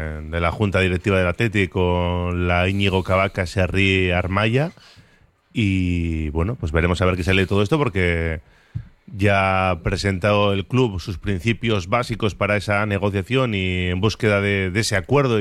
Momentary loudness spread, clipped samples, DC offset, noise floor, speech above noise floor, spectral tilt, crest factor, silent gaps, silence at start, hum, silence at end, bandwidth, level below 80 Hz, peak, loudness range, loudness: 6 LU; under 0.1%; under 0.1%; -56 dBFS; 36 dB; -6 dB/octave; 16 dB; none; 0 s; none; 0 s; 12.5 kHz; -36 dBFS; -4 dBFS; 2 LU; -20 LUFS